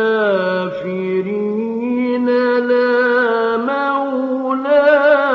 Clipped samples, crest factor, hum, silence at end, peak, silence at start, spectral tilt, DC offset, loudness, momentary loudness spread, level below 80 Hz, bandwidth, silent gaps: under 0.1%; 12 dB; none; 0 s; -2 dBFS; 0 s; -3.5 dB/octave; under 0.1%; -16 LUFS; 8 LU; -64 dBFS; 6 kHz; none